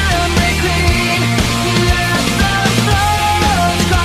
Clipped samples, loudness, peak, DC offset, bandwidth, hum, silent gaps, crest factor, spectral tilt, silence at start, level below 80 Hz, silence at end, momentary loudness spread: under 0.1%; -13 LUFS; -2 dBFS; under 0.1%; 15.5 kHz; none; none; 12 dB; -4 dB/octave; 0 s; -22 dBFS; 0 s; 1 LU